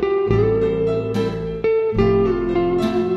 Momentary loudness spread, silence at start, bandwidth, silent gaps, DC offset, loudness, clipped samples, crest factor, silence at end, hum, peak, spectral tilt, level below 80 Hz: 5 LU; 0 s; 10.5 kHz; none; under 0.1%; -19 LUFS; under 0.1%; 16 dB; 0 s; none; -4 dBFS; -8.5 dB/octave; -36 dBFS